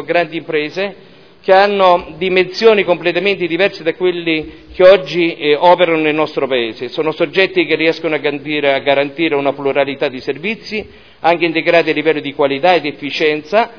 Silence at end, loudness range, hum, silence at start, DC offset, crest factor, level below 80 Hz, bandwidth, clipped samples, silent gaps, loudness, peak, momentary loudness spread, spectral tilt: 0 s; 3 LU; none; 0 s; 0.4%; 14 dB; -52 dBFS; 5.4 kHz; 0.2%; none; -14 LUFS; 0 dBFS; 9 LU; -6 dB/octave